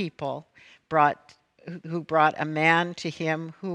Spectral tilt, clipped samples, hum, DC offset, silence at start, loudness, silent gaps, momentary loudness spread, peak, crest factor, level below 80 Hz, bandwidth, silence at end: -6 dB/octave; under 0.1%; none; under 0.1%; 0 s; -25 LUFS; none; 17 LU; -6 dBFS; 20 dB; -70 dBFS; 10 kHz; 0 s